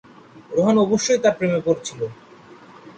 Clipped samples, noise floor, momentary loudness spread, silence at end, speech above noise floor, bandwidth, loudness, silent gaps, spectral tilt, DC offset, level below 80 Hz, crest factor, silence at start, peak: under 0.1%; -45 dBFS; 12 LU; 0.05 s; 26 dB; 9.2 kHz; -20 LUFS; none; -5 dB/octave; under 0.1%; -60 dBFS; 16 dB; 0.35 s; -6 dBFS